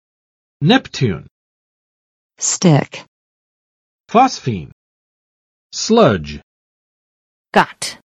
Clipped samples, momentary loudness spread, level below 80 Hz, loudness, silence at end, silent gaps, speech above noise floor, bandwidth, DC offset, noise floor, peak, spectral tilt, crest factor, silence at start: under 0.1%; 17 LU; -48 dBFS; -15 LUFS; 0.1 s; 1.31-2.30 s, 3.08-4.04 s, 4.72-5.70 s, 6.43-7.45 s; over 75 dB; 14 kHz; under 0.1%; under -90 dBFS; 0 dBFS; -4.5 dB/octave; 18 dB; 0.6 s